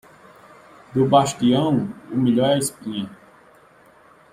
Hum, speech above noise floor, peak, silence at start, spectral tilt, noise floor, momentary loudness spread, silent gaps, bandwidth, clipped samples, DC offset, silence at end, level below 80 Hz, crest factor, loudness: none; 32 dB; -2 dBFS; 0.95 s; -5.5 dB/octave; -52 dBFS; 13 LU; none; 16 kHz; under 0.1%; under 0.1%; 1.2 s; -58 dBFS; 20 dB; -20 LUFS